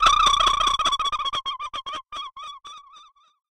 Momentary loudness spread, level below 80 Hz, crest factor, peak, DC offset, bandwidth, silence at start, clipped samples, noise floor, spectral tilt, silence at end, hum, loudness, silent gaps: 21 LU; -42 dBFS; 18 dB; -6 dBFS; under 0.1%; 13.5 kHz; 0 s; under 0.1%; -52 dBFS; 0 dB/octave; 0.5 s; none; -21 LUFS; none